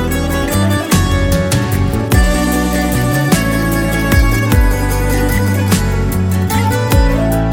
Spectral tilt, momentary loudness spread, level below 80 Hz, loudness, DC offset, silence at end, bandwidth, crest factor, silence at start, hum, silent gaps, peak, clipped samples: -5.5 dB/octave; 3 LU; -18 dBFS; -14 LUFS; under 0.1%; 0 s; 17.5 kHz; 12 dB; 0 s; none; none; 0 dBFS; under 0.1%